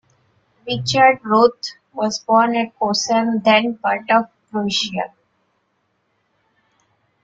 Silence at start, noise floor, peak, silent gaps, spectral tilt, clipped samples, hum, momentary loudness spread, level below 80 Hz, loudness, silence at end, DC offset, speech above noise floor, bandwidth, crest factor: 0.65 s; -68 dBFS; -2 dBFS; none; -4 dB/octave; under 0.1%; none; 13 LU; -62 dBFS; -17 LUFS; 2.15 s; under 0.1%; 50 dB; 9 kHz; 18 dB